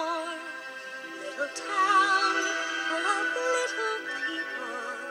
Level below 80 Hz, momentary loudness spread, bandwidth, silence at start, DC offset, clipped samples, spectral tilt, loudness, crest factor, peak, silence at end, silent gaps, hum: under -90 dBFS; 15 LU; 16 kHz; 0 s; under 0.1%; under 0.1%; 0 dB/octave; -28 LUFS; 16 dB; -12 dBFS; 0 s; none; none